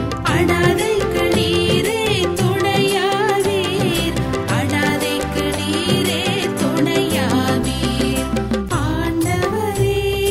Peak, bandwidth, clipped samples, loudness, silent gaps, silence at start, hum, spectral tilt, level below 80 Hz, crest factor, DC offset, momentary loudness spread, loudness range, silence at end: -2 dBFS; 16 kHz; under 0.1%; -18 LUFS; none; 0 s; none; -5 dB/octave; -34 dBFS; 16 dB; under 0.1%; 4 LU; 2 LU; 0 s